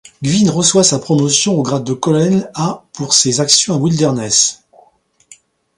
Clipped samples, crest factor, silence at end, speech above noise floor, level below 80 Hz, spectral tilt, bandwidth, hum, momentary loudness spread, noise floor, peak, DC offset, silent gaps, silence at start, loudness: under 0.1%; 14 dB; 1.25 s; 39 dB; -54 dBFS; -4 dB/octave; 16 kHz; none; 7 LU; -53 dBFS; 0 dBFS; under 0.1%; none; 0.2 s; -13 LUFS